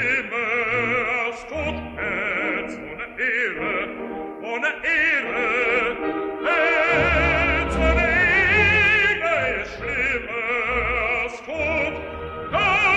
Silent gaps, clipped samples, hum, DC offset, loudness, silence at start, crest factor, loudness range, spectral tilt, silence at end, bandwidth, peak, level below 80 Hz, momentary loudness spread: none; under 0.1%; none; under 0.1%; -20 LUFS; 0 s; 16 dB; 7 LU; -5 dB/octave; 0 s; 11.5 kHz; -6 dBFS; -36 dBFS; 12 LU